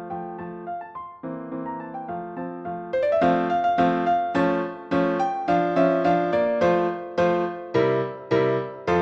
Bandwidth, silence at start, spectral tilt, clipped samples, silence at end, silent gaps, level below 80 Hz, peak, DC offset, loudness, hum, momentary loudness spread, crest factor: 7.8 kHz; 0 s; -7.5 dB/octave; under 0.1%; 0 s; none; -58 dBFS; -8 dBFS; under 0.1%; -23 LUFS; none; 13 LU; 16 dB